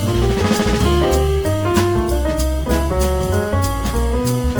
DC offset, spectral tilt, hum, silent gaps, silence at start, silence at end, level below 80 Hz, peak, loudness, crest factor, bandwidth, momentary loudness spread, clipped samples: under 0.1%; -6 dB/octave; none; none; 0 s; 0 s; -22 dBFS; -2 dBFS; -18 LUFS; 16 dB; over 20 kHz; 4 LU; under 0.1%